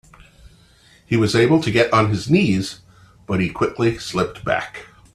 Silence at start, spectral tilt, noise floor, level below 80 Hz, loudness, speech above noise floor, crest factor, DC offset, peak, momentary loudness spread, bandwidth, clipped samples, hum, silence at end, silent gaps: 1.1 s; -6 dB/octave; -52 dBFS; -48 dBFS; -19 LUFS; 33 dB; 18 dB; under 0.1%; -2 dBFS; 11 LU; 13 kHz; under 0.1%; none; 0.3 s; none